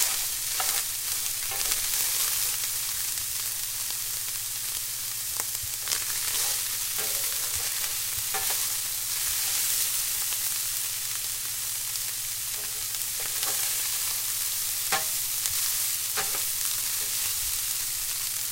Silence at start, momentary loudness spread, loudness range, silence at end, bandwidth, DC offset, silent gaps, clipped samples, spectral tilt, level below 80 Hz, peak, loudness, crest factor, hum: 0 s; 4 LU; 2 LU; 0 s; 17 kHz; under 0.1%; none; under 0.1%; 1.5 dB/octave; -54 dBFS; -2 dBFS; -26 LUFS; 28 dB; none